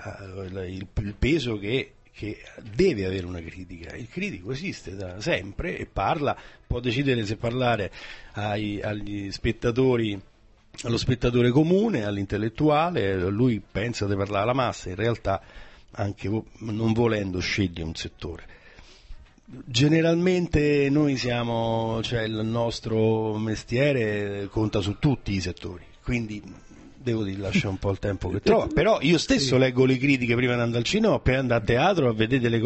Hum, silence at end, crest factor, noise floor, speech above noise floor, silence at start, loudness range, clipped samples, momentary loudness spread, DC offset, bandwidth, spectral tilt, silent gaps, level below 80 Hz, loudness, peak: none; 0 s; 18 dB; -49 dBFS; 25 dB; 0 s; 7 LU; under 0.1%; 15 LU; under 0.1%; 8.4 kHz; -6 dB/octave; none; -42 dBFS; -25 LUFS; -8 dBFS